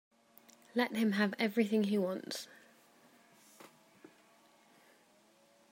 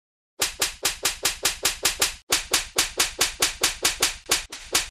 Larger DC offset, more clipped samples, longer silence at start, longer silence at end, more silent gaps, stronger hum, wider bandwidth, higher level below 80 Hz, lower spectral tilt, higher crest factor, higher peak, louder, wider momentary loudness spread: neither; neither; first, 0.75 s vs 0.4 s; first, 2.1 s vs 0 s; second, none vs 2.23-2.27 s; neither; about the same, 16 kHz vs 16 kHz; second, -90 dBFS vs -46 dBFS; first, -5.5 dB/octave vs 0.5 dB/octave; about the same, 22 dB vs 20 dB; second, -16 dBFS vs -6 dBFS; second, -34 LUFS vs -23 LUFS; first, 24 LU vs 3 LU